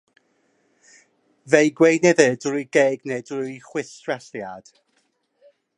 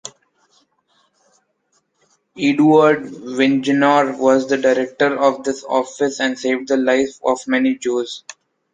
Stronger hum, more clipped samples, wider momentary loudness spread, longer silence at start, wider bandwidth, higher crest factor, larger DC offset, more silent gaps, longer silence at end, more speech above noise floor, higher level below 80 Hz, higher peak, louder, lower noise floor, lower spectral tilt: neither; neither; first, 17 LU vs 9 LU; first, 1.45 s vs 0.05 s; first, 10.5 kHz vs 9.4 kHz; first, 22 dB vs 16 dB; neither; neither; first, 1.2 s vs 0.4 s; about the same, 48 dB vs 49 dB; second, -74 dBFS vs -64 dBFS; about the same, 0 dBFS vs -2 dBFS; second, -20 LUFS vs -17 LUFS; about the same, -68 dBFS vs -65 dBFS; about the same, -4.5 dB/octave vs -5 dB/octave